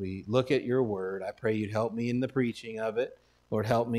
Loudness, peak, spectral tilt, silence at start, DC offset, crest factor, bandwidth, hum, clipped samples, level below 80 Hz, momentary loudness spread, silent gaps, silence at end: -31 LUFS; -12 dBFS; -7 dB/octave; 0 s; under 0.1%; 20 dB; 13.5 kHz; none; under 0.1%; -64 dBFS; 7 LU; none; 0 s